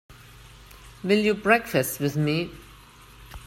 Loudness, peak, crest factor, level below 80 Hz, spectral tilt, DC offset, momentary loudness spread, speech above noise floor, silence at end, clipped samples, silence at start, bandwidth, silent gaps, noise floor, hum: -24 LUFS; -4 dBFS; 22 dB; -52 dBFS; -5 dB/octave; under 0.1%; 14 LU; 26 dB; 0 s; under 0.1%; 0.1 s; 16.5 kHz; none; -49 dBFS; 50 Hz at -45 dBFS